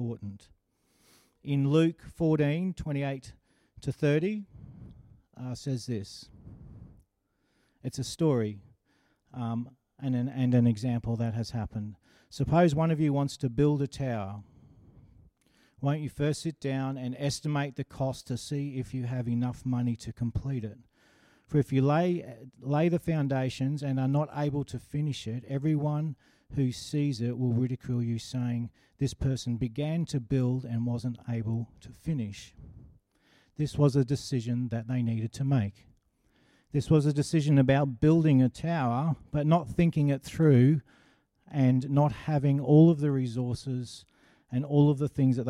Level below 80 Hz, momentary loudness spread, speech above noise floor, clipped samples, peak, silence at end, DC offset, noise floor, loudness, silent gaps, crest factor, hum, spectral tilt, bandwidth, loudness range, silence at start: -54 dBFS; 14 LU; 48 dB; under 0.1%; -10 dBFS; 0 s; under 0.1%; -75 dBFS; -29 LUFS; none; 18 dB; none; -7.5 dB/octave; 12 kHz; 9 LU; 0 s